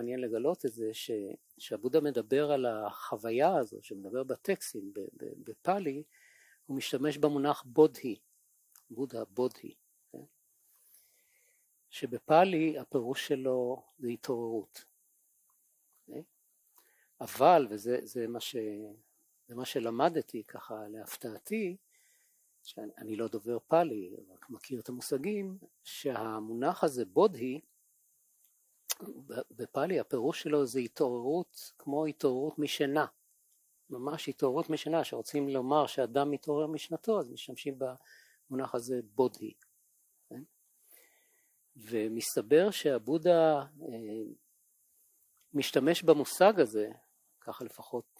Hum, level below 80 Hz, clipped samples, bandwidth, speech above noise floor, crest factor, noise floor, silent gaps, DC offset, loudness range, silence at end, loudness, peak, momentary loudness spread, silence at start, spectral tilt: none; -82 dBFS; under 0.1%; 16 kHz; 40 dB; 24 dB; -72 dBFS; none; under 0.1%; 8 LU; 0.2 s; -32 LUFS; -10 dBFS; 20 LU; 0 s; -5 dB/octave